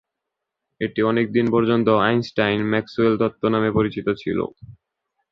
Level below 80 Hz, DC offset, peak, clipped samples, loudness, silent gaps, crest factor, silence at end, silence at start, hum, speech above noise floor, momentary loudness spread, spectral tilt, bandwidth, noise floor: -52 dBFS; under 0.1%; -2 dBFS; under 0.1%; -20 LUFS; none; 18 dB; 0.6 s; 0.8 s; none; 62 dB; 8 LU; -8 dB/octave; 6.6 kHz; -82 dBFS